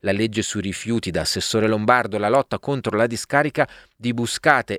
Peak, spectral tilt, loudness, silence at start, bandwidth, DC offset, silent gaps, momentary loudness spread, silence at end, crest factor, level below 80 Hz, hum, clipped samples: 0 dBFS; -4.5 dB/octave; -21 LUFS; 0.05 s; 16 kHz; under 0.1%; none; 7 LU; 0 s; 20 dB; -50 dBFS; none; under 0.1%